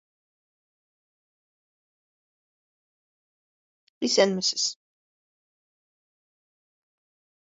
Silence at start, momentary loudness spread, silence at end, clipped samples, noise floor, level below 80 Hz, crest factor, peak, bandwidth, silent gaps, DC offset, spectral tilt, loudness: 4 s; 7 LU; 2.75 s; under 0.1%; under -90 dBFS; -78 dBFS; 28 dB; -6 dBFS; 7.6 kHz; none; under 0.1%; -2.5 dB/octave; -24 LUFS